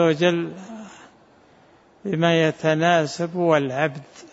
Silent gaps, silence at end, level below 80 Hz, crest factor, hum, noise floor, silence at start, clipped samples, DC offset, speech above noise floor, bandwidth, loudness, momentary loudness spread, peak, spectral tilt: none; 0.05 s; -68 dBFS; 18 dB; none; -54 dBFS; 0 s; under 0.1%; under 0.1%; 33 dB; 8 kHz; -21 LUFS; 20 LU; -4 dBFS; -6 dB/octave